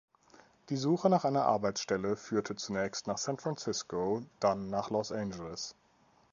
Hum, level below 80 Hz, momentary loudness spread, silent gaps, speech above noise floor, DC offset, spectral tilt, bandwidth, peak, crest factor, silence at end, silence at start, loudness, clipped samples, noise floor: none; -66 dBFS; 11 LU; none; 34 dB; under 0.1%; -5 dB/octave; 7.4 kHz; -14 dBFS; 20 dB; 0.6 s; 0.7 s; -33 LUFS; under 0.1%; -67 dBFS